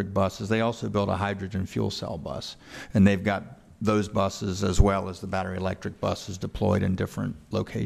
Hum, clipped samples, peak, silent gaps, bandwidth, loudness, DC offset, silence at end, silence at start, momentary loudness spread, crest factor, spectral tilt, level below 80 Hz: none; under 0.1%; -6 dBFS; none; 14 kHz; -27 LUFS; under 0.1%; 0 s; 0 s; 11 LU; 20 dB; -6.5 dB/octave; -36 dBFS